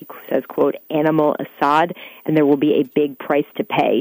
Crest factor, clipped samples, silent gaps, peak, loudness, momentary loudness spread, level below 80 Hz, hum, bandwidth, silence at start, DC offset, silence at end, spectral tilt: 14 dB; under 0.1%; none; -4 dBFS; -19 LUFS; 7 LU; -64 dBFS; none; 16 kHz; 0 s; under 0.1%; 0 s; -7.5 dB/octave